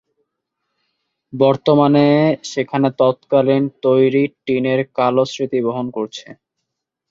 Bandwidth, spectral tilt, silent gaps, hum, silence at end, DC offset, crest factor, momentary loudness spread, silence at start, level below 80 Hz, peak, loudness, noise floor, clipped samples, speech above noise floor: 7.6 kHz; -7 dB/octave; none; none; 0.75 s; under 0.1%; 16 dB; 10 LU; 1.35 s; -62 dBFS; -2 dBFS; -16 LUFS; -78 dBFS; under 0.1%; 63 dB